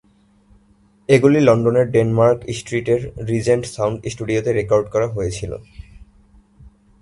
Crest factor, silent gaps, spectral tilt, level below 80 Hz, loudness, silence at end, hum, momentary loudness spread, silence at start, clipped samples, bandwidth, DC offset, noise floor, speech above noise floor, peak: 18 dB; none; -6.5 dB/octave; -44 dBFS; -18 LUFS; 0.35 s; none; 12 LU; 1.1 s; under 0.1%; 11.5 kHz; under 0.1%; -55 dBFS; 38 dB; 0 dBFS